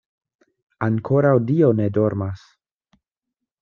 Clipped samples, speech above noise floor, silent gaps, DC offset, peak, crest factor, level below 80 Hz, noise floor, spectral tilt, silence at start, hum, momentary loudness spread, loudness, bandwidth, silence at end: under 0.1%; 65 dB; none; under 0.1%; -4 dBFS; 18 dB; -60 dBFS; -83 dBFS; -11 dB/octave; 0.8 s; none; 11 LU; -20 LUFS; 6.8 kHz; 1.25 s